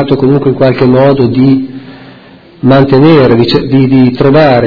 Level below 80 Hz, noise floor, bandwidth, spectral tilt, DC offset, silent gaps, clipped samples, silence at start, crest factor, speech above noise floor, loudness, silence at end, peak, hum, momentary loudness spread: -36 dBFS; -35 dBFS; 5.4 kHz; -9.5 dB/octave; under 0.1%; none; 4%; 0 s; 6 dB; 29 dB; -7 LUFS; 0 s; 0 dBFS; none; 5 LU